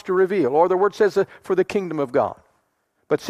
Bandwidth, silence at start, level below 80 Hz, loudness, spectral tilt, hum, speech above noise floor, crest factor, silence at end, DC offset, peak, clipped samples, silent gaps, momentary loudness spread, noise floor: 12 kHz; 0.05 s; -64 dBFS; -21 LUFS; -6.5 dB/octave; none; 50 dB; 16 dB; 0 s; under 0.1%; -4 dBFS; under 0.1%; none; 6 LU; -69 dBFS